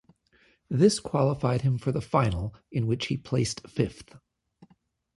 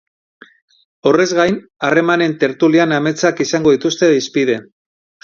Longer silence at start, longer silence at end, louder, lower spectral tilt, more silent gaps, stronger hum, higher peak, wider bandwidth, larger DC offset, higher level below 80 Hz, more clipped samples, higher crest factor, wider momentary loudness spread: second, 0.7 s vs 1.05 s; first, 1 s vs 0.6 s; second, -27 LUFS vs -15 LUFS; about the same, -6 dB/octave vs -5 dB/octave; neither; neither; second, -8 dBFS vs 0 dBFS; first, 11.5 kHz vs 7.4 kHz; neither; first, -50 dBFS vs -56 dBFS; neither; about the same, 20 dB vs 16 dB; first, 9 LU vs 5 LU